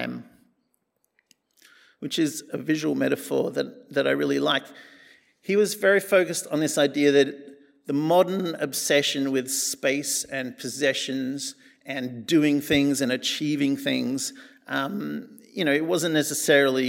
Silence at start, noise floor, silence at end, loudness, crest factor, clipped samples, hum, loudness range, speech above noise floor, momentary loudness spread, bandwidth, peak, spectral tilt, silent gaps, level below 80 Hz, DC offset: 0 s; -73 dBFS; 0 s; -24 LUFS; 20 dB; under 0.1%; none; 4 LU; 49 dB; 12 LU; 16.5 kHz; -6 dBFS; -3.5 dB/octave; none; -68 dBFS; under 0.1%